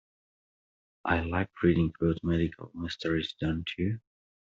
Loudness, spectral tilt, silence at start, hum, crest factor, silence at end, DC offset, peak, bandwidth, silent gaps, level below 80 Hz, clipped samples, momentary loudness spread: -30 LUFS; -5.5 dB/octave; 1.05 s; none; 20 dB; 0.4 s; under 0.1%; -10 dBFS; 7.4 kHz; none; -50 dBFS; under 0.1%; 11 LU